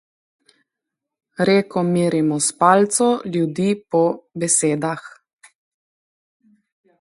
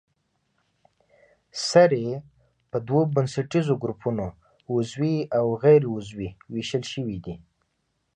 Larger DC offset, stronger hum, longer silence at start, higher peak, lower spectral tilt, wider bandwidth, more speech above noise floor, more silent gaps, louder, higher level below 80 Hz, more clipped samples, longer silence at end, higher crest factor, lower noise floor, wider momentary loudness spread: neither; neither; second, 1.4 s vs 1.55 s; first, 0 dBFS vs -4 dBFS; second, -4.5 dB/octave vs -6.5 dB/octave; first, 11.5 kHz vs 9.8 kHz; first, 65 dB vs 51 dB; neither; first, -18 LUFS vs -24 LUFS; second, -66 dBFS vs -56 dBFS; neither; first, 1.95 s vs 0.8 s; about the same, 20 dB vs 20 dB; first, -83 dBFS vs -74 dBFS; second, 9 LU vs 17 LU